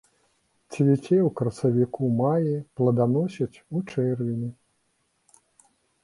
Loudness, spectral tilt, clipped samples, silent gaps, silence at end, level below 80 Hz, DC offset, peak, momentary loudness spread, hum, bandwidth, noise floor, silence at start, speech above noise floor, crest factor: -25 LUFS; -9 dB/octave; under 0.1%; none; 1.5 s; -62 dBFS; under 0.1%; -8 dBFS; 10 LU; none; 11.5 kHz; -71 dBFS; 0.7 s; 48 dB; 16 dB